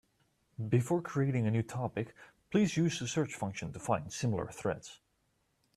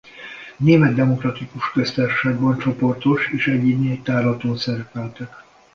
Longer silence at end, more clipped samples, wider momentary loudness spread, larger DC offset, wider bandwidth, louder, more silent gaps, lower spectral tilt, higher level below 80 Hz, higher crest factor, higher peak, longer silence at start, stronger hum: first, 0.8 s vs 0.35 s; neither; second, 11 LU vs 16 LU; neither; first, 13.5 kHz vs 7 kHz; second, -34 LUFS vs -19 LUFS; neither; second, -6 dB/octave vs -7.5 dB/octave; second, -66 dBFS vs -54 dBFS; about the same, 18 dB vs 18 dB; second, -16 dBFS vs -2 dBFS; first, 0.6 s vs 0.15 s; neither